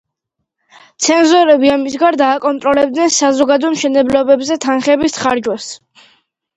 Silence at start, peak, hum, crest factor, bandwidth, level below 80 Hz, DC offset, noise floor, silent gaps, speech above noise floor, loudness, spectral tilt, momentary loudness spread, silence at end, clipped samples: 1 s; 0 dBFS; none; 14 dB; 8.8 kHz; -52 dBFS; under 0.1%; -74 dBFS; none; 62 dB; -12 LUFS; -2.5 dB/octave; 8 LU; 0.8 s; under 0.1%